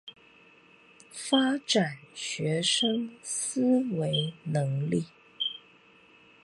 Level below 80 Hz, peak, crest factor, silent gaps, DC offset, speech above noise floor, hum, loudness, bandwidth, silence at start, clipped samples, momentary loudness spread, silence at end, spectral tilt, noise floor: -72 dBFS; -10 dBFS; 20 dB; none; under 0.1%; 30 dB; none; -28 LUFS; 11.5 kHz; 0.05 s; under 0.1%; 12 LU; 0.85 s; -4 dB/octave; -58 dBFS